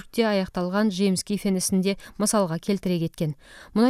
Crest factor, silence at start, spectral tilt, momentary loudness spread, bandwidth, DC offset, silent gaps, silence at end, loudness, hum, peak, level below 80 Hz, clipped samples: 16 dB; 0.15 s; -5 dB/octave; 7 LU; 15.5 kHz; under 0.1%; none; 0 s; -25 LUFS; none; -8 dBFS; -52 dBFS; under 0.1%